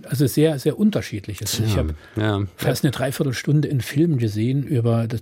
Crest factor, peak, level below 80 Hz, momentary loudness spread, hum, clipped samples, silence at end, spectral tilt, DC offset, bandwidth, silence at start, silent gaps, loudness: 14 dB; -6 dBFS; -44 dBFS; 6 LU; none; under 0.1%; 0 s; -6 dB/octave; under 0.1%; 16.5 kHz; 0.05 s; none; -21 LUFS